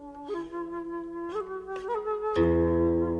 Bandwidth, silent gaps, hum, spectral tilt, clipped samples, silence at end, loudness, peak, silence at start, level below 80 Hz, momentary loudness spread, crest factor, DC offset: 6.8 kHz; none; none; -9 dB/octave; under 0.1%; 0 s; -30 LUFS; -14 dBFS; 0 s; -46 dBFS; 12 LU; 16 dB; under 0.1%